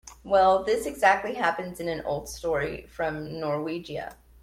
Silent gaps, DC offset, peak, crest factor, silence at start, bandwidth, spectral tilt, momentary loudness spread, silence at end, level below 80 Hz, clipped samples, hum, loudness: none; under 0.1%; -8 dBFS; 20 dB; 0.05 s; 16 kHz; -4.5 dB/octave; 12 LU; 0.3 s; -52 dBFS; under 0.1%; none; -26 LUFS